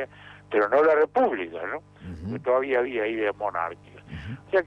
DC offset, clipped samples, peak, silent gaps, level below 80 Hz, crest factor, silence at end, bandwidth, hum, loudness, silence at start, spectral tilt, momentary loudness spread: under 0.1%; under 0.1%; -12 dBFS; none; -54 dBFS; 14 dB; 0 s; 6.6 kHz; 50 Hz at -55 dBFS; -25 LUFS; 0 s; -7.5 dB/octave; 18 LU